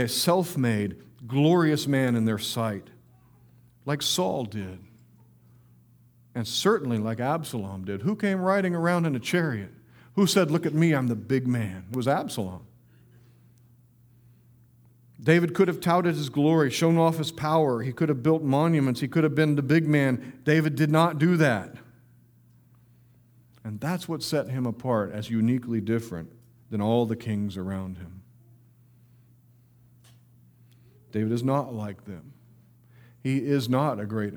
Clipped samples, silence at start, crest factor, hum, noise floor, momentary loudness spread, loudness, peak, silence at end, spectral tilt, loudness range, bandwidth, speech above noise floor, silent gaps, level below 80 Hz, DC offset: under 0.1%; 0 s; 22 dB; none; -58 dBFS; 13 LU; -25 LUFS; -6 dBFS; 0 s; -6 dB/octave; 10 LU; over 20 kHz; 33 dB; none; -66 dBFS; under 0.1%